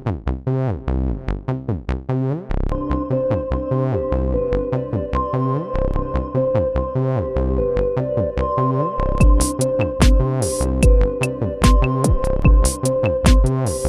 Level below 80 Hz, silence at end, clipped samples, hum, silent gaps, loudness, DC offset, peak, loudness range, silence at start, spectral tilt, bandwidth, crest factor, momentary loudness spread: -20 dBFS; 0 s; under 0.1%; none; none; -20 LUFS; 0.2%; 0 dBFS; 5 LU; 0 s; -6.5 dB/octave; 14 kHz; 16 dB; 8 LU